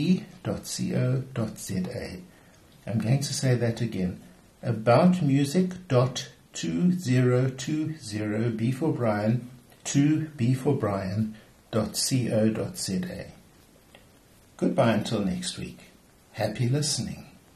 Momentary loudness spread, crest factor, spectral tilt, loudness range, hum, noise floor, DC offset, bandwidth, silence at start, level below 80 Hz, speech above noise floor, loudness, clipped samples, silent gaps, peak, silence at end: 13 LU; 20 dB; -6 dB/octave; 5 LU; none; -56 dBFS; under 0.1%; 13 kHz; 0 s; -58 dBFS; 31 dB; -27 LUFS; under 0.1%; none; -8 dBFS; 0.25 s